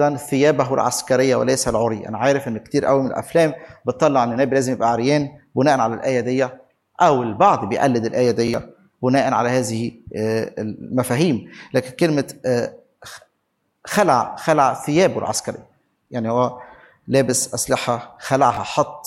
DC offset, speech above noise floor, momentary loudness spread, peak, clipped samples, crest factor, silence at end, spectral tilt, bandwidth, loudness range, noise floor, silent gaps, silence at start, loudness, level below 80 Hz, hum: under 0.1%; 52 dB; 9 LU; -2 dBFS; under 0.1%; 18 dB; 0.05 s; -5 dB/octave; 16 kHz; 3 LU; -71 dBFS; none; 0 s; -19 LUFS; -54 dBFS; none